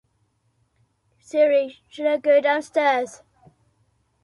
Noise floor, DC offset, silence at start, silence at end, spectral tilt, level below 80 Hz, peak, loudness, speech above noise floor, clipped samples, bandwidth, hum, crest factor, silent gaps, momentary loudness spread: -68 dBFS; under 0.1%; 1.35 s; 1.1 s; -3.5 dB/octave; -72 dBFS; -8 dBFS; -21 LUFS; 48 dB; under 0.1%; 11.5 kHz; none; 16 dB; none; 10 LU